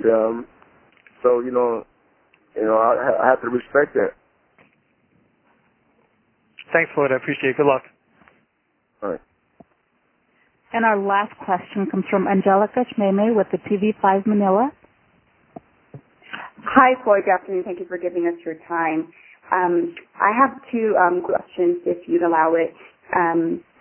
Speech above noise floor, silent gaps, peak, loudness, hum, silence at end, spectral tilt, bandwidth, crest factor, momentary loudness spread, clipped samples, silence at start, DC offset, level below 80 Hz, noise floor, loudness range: 49 dB; none; 0 dBFS; -20 LUFS; none; 0.2 s; -10.5 dB/octave; 3.3 kHz; 22 dB; 10 LU; under 0.1%; 0 s; under 0.1%; -64 dBFS; -68 dBFS; 6 LU